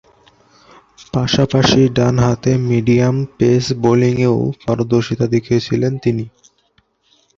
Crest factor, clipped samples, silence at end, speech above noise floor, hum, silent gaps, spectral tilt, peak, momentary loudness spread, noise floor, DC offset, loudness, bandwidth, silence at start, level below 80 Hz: 16 dB; under 0.1%; 1.1 s; 45 dB; none; none; -6.5 dB/octave; 0 dBFS; 7 LU; -60 dBFS; under 0.1%; -15 LUFS; 7.6 kHz; 1 s; -42 dBFS